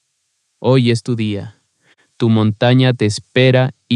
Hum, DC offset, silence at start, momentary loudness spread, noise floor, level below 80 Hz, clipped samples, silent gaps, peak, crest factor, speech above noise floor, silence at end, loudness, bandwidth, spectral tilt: none; under 0.1%; 0.6 s; 9 LU; -68 dBFS; -62 dBFS; under 0.1%; none; 0 dBFS; 14 dB; 54 dB; 0 s; -15 LUFS; 10.5 kHz; -6.5 dB/octave